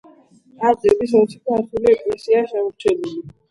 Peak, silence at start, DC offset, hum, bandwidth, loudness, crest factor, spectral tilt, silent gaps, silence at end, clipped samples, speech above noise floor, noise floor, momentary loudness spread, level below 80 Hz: -2 dBFS; 0.6 s; under 0.1%; none; 11.5 kHz; -18 LUFS; 18 dB; -6.5 dB/octave; none; 0.2 s; under 0.1%; 32 dB; -50 dBFS; 8 LU; -54 dBFS